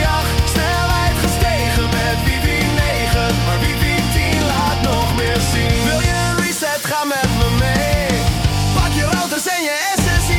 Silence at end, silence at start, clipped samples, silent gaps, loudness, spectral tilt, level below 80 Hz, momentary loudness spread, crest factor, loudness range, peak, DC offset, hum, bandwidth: 0 s; 0 s; under 0.1%; none; -16 LUFS; -4.5 dB/octave; -24 dBFS; 2 LU; 14 dB; 0 LU; -2 dBFS; under 0.1%; none; 18 kHz